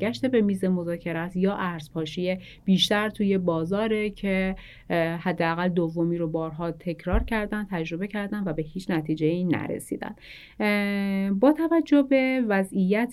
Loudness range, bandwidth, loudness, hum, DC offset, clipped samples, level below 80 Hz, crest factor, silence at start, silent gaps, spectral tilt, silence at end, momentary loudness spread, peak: 5 LU; 13 kHz; -26 LUFS; none; under 0.1%; under 0.1%; -42 dBFS; 16 dB; 0 s; none; -6.5 dB/octave; 0 s; 10 LU; -8 dBFS